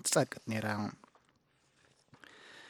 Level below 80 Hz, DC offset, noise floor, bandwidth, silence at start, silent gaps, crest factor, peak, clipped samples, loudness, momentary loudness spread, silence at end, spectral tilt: -78 dBFS; under 0.1%; -72 dBFS; 17 kHz; 0.05 s; none; 24 dB; -14 dBFS; under 0.1%; -35 LUFS; 25 LU; 0 s; -3.5 dB/octave